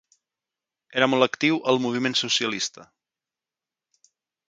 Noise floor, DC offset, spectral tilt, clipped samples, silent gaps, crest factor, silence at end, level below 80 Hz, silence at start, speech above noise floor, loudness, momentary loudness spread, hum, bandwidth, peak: -90 dBFS; under 0.1%; -3 dB/octave; under 0.1%; none; 24 dB; 1.65 s; -74 dBFS; 0.9 s; 67 dB; -23 LUFS; 8 LU; none; 9.4 kHz; -4 dBFS